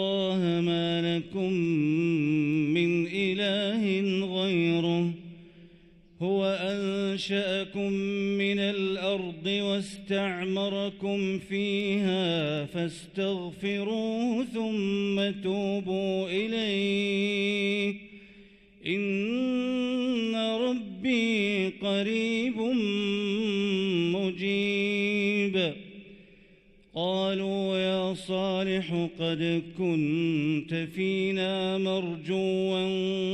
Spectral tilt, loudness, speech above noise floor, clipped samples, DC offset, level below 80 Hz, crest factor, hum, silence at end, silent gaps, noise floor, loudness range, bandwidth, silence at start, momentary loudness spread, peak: -6 dB/octave; -28 LUFS; 30 dB; under 0.1%; under 0.1%; -64 dBFS; 14 dB; none; 0 s; none; -58 dBFS; 3 LU; 11 kHz; 0 s; 5 LU; -14 dBFS